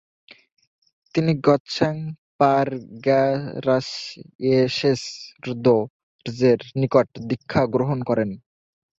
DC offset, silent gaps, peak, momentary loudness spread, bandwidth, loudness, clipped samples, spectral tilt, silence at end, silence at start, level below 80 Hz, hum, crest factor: under 0.1%; 1.60-1.65 s, 2.18-2.39 s, 4.35-4.39 s, 5.90-6.19 s; -4 dBFS; 14 LU; 8 kHz; -22 LUFS; under 0.1%; -6.5 dB/octave; 0.6 s; 1.15 s; -58 dBFS; none; 20 dB